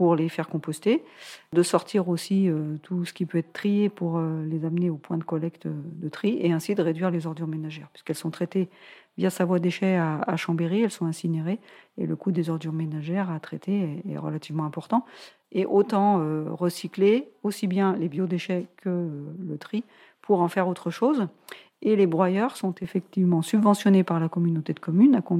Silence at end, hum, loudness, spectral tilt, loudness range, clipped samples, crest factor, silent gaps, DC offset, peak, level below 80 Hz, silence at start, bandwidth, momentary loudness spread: 0 s; none; -26 LUFS; -7 dB/octave; 5 LU; under 0.1%; 18 dB; none; under 0.1%; -8 dBFS; -76 dBFS; 0 s; 15.5 kHz; 12 LU